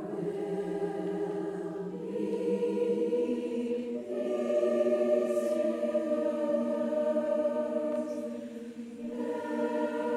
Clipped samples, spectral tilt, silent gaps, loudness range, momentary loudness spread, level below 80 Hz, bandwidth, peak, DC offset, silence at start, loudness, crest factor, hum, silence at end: under 0.1%; -7 dB/octave; none; 3 LU; 9 LU; -76 dBFS; 12.5 kHz; -16 dBFS; under 0.1%; 0 s; -31 LUFS; 14 dB; none; 0 s